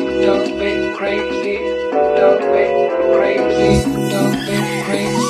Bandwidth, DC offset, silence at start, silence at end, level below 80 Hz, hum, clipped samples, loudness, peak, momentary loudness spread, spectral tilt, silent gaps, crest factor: 13 kHz; under 0.1%; 0 s; 0 s; -38 dBFS; none; under 0.1%; -16 LUFS; 0 dBFS; 6 LU; -5.5 dB/octave; none; 14 dB